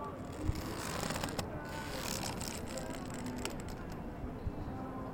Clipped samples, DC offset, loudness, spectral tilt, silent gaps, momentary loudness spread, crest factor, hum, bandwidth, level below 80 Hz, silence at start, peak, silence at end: under 0.1%; under 0.1%; -41 LUFS; -4.5 dB/octave; none; 6 LU; 22 dB; none; 17 kHz; -50 dBFS; 0 s; -18 dBFS; 0 s